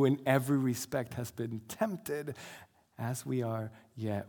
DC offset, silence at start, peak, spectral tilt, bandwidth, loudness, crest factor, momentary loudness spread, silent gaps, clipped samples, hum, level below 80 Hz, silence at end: under 0.1%; 0 s; -12 dBFS; -6 dB/octave; 19.5 kHz; -35 LUFS; 20 dB; 15 LU; none; under 0.1%; none; -72 dBFS; 0 s